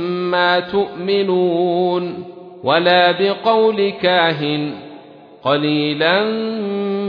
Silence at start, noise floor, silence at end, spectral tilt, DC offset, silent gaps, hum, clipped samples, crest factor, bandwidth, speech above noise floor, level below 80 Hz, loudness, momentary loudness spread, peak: 0 s; -40 dBFS; 0 s; -8 dB/octave; under 0.1%; none; none; under 0.1%; 16 dB; 5.2 kHz; 24 dB; -62 dBFS; -16 LUFS; 11 LU; -2 dBFS